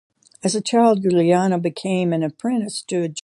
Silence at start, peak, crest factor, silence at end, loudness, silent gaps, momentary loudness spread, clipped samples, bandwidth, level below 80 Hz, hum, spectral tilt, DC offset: 0.45 s; -4 dBFS; 16 dB; 0.05 s; -20 LUFS; none; 8 LU; under 0.1%; 11.5 kHz; -66 dBFS; none; -5.5 dB/octave; under 0.1%